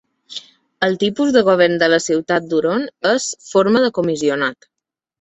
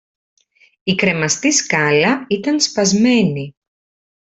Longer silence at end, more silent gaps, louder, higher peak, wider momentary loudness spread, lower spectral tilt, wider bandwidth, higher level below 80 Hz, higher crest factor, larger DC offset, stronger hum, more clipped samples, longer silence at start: second, 0.7 s vs 0.9 s; neither; about the same, -17 LUFS vs -15 LUFS; about the same, -2 dBFS vs 0 dBFS; about the same, 9 LU vs 7 LU; about the same, -4 dB/octave vs -3.5 dB/octave; about the same, 8.4 kHz vs 8.4 kHz; about the same, -60 dBFS vs -56 dBFS; about the same, 16 dB vs 18 dB; neither; neither; neither; second, 0.3 s vs 0.85 s